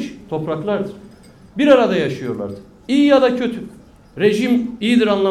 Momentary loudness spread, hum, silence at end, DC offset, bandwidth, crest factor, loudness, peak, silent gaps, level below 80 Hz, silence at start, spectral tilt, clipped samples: 17 LU; none; 0 s; under 0.1%; 12.5 kHz; 16 dB; -17 LUFS; 0 dBFS; none; -52 dBFS; 0 s; -6 dB/octave; under 0.1%